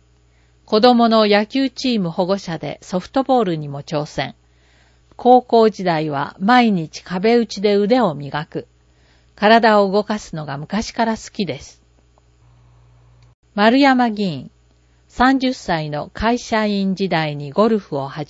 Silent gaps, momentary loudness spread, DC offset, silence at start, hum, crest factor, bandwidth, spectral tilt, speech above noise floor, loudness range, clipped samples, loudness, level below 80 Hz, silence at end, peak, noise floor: 13.34-13.43 s; 14 LU; under 0.1%; 0.7 s; none; 18 dB; 8 kHz; -6 dB/octave; 38 dB; 5 LU; under 0.1%; -17 LUFS; -48 dBFS; 0.05 s; 0 dBFS; -54 dBFS